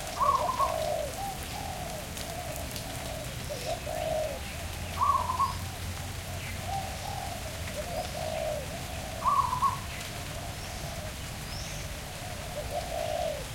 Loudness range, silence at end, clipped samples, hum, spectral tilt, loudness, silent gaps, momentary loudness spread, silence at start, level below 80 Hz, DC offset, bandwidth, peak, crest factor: 4 LU; 0 s; under 0.1%; none; -3.5 dB/octave; -33 LUFS; none; 10 LU; 0 s; -44 dBFS; under 0.1%; 17 kHz; -14 dBFS; 18 dB